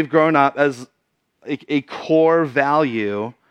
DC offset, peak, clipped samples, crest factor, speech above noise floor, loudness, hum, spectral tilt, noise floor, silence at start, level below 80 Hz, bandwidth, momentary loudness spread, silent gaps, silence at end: under 0.1%; 0 dBFS; under 0.1%; 18 dB; 48 dB; -18 LUFS; none; -7 dB/octave; -66 dBFS; 0 s; -76 dBFS; 9.8 kHz; 13 LU; none; 0.2 s